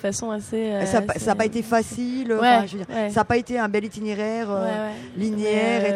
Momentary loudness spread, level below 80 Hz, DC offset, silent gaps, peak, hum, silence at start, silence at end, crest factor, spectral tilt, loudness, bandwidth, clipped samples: 8 LU; -54 dBFS; under 0.1%; none; -4 dBFS; none; 0 s; 0 s; 18 dB; -5 dB/octave; -23 LUFS; 14.5 kHz; under 0.1%